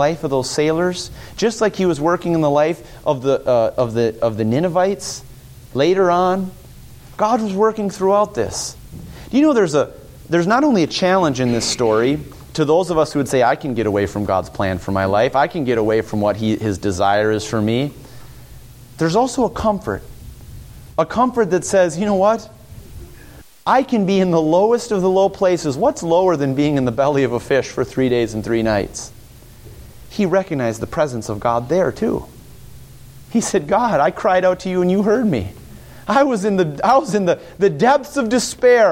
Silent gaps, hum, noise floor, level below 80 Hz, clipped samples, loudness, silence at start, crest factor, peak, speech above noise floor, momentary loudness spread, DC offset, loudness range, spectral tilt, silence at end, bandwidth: none; none; -42 dBFS; -44 dBFS; under 0.1%; -17 LUFS; 0 s; 16 dB; -2 dBFS; 25 dB; 8 LU; under 0.1%; 4 LU; -5.5 dB/octave; 0 s; 17 kHz